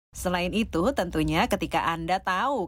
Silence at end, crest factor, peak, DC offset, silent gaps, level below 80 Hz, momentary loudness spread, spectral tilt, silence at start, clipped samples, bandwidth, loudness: 0 s; 16 dB; -10 dBFS; under 0.1%; none; -42 dBFS; 3 LU; -5 dB/octave; 0.15 s; under 0.1%; 16.5 kHz; -26 LUFS